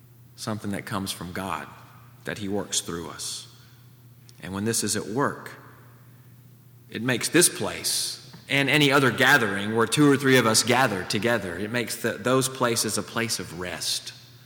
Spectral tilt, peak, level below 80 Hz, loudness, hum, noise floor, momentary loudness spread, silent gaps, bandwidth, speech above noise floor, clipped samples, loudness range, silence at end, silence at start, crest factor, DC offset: -3 dB/octave; -4 dBFS; -64 dBFS; -24 LUFS; none; -51 dBFS; 16 LU; none; over 20 kHz; 26 dB; under 0.1%; 11 LU; 0.1 s; 0.4 s; 22 dB; under 0.1%